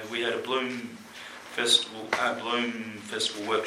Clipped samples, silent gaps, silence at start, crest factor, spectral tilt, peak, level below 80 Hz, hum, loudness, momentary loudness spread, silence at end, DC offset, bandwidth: under 0.1%; none; 0 s; 22 dB; -1.5 dB/octave; -8 dBFS; -74 dBFS; none; -28 LUFS; 19 LU; 0 s; under 0.1%; 16 kHz